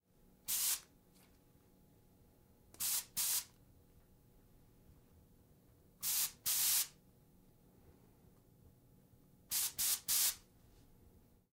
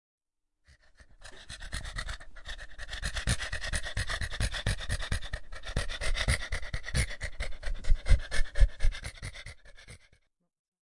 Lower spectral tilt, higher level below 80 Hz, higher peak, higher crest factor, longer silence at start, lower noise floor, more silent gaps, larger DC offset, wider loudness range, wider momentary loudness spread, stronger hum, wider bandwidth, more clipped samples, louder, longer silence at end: second, 1.5 dB/octave vs -3.5 dB/octave; second, -72 dBFS vs -34 dBFS; second, -22 dBFS vs -8 dBFS; about the same, 22 dB vs 22 dB; second, 0.5 s vs 1.2 s; second, -68 dBFS vs -77 dBFS; neither; neither; about the same, 4 LU vs 5 LU; second, 10 LU vs 16 LU; neither; first, 16 kHz vs 11.5 kHz; neither; about the same, -35 LUFS vs -35 LUFS; first, 1.15 s vs 1 s